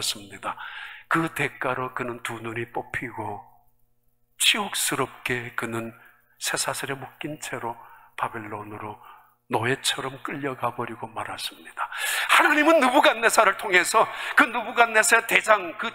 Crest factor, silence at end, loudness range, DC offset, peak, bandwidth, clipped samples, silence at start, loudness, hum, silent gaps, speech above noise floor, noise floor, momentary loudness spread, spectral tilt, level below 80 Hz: 24 dB; 0 s; 12 LU; 0.1%; 0 dBFS; 16 kHz; under 0.1%; 0 s; -23 LUFS; none; none; 44 dB; -69 dBFS; 18 LU; -2.5 dB/octave; -64 dBFS